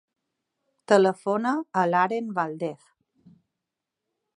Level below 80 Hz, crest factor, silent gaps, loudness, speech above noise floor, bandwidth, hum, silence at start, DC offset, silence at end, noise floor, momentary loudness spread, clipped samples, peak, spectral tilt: -80 dBFS; 24 dB; none; -24 LUFS; 62 dB; 11 kHz; none; 0.9 s; under 0.1%; 1.65 s; -86 dBFS; 10 LU; under 0.1%; -4 dBFS; -6 dB/octave